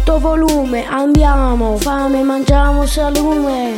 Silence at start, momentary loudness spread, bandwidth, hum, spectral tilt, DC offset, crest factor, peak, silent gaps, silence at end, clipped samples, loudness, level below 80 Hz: 0 s; 4 LU; 17 kHz; none; -6 dB/octave; under 0.1%; 12 dB; 0 dBFS; none; 0 s; under 0.1%; -14 LUFS; -16 dBFS